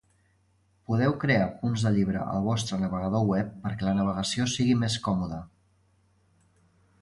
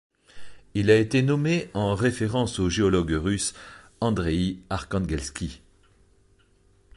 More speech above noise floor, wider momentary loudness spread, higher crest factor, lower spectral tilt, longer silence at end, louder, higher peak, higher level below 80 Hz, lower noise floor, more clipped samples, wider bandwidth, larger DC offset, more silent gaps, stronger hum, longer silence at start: about the same, 40 dB vs 37 dB; second, 6 LU vs 12 LU; about the same, 18 dB vs 20 dB; about the same, -6 dB/octave vs -5.5 dB/octave; first, 1.55 s vs 1.4 s; about the same, -27 LUFS vs -25 LUFS; second, -10 dBFS vs -6 dBFS; second, -52 dBFS vs -42 dBFS; first, -67 dBFS vs -61 dBFS; neither; about the same, 11.5 kHz vs 11.5 kHz; neither; neither; neither; first, 0.9 s vs 0.35 s